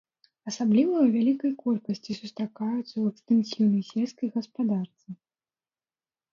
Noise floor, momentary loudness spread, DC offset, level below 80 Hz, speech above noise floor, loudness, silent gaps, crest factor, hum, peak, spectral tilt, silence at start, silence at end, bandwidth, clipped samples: under -90 dBFS; 15 LU; under 0.1%; -76 dBFS; over 64 dB; -27 LUFS; none; 16 dB; none; -12 dBFS; -7 dB/octave; 0.45 s; 1.2 s; 7.4 kHz; under 0.1%